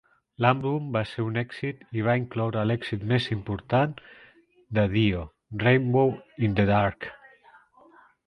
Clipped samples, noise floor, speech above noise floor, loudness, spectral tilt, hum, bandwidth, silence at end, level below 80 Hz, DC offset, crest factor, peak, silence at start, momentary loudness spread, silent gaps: under 0.1%; -57 dBFS; 32 dB; -26 LUFS; -8.5 dB/octave; none; 9.4 kHz; 1.1 s; -50 dBFS; under 0.1%; 22 dB; -4 dBFS; 0.4 s; 10 LU; none